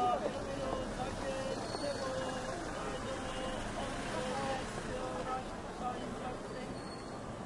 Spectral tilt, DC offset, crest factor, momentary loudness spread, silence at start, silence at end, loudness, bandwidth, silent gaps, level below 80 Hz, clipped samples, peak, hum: -4.5 dB/octave; under 0.1%; 18 dB; 6 LU; 0 s; 0 s; -39 LUFS; 11.5 kHz; none; -52 dBFS; under 0.1%; -22 dBFS; none